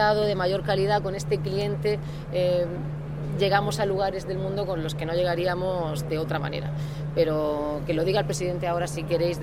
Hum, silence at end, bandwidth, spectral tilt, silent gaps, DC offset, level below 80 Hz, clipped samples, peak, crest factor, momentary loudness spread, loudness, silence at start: none; 0 s; 15.5 kHz; -6 dB/octave; none; under 0.1%; -44 dBFS; under 0.1%; -8 dBFS; 18 dB; 7 LU; -26 LUFS; 0 s